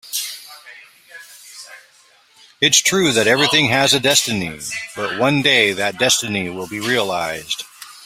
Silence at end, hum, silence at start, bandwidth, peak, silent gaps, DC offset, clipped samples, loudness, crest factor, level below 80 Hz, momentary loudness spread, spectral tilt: 0 s; none; 0.05 s; 16 kHz; 0 dBFS; none; under 0.1%; under 0.1%; -16 LUFS; 20 dB; -56 dBFS; 21 LU; -2 dB/octave